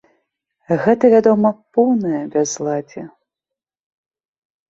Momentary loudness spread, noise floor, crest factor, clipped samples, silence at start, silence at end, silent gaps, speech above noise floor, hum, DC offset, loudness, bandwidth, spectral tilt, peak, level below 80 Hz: 12 LU; -86 dBFS; 16 dB; under 0.1%; 0.7 s; 1.6 s; none; 70 dB; none; under 0.1%; -16 LUFS; 7.8 kHz; -6 dB/octave; -2 dBFS; -62 dBFS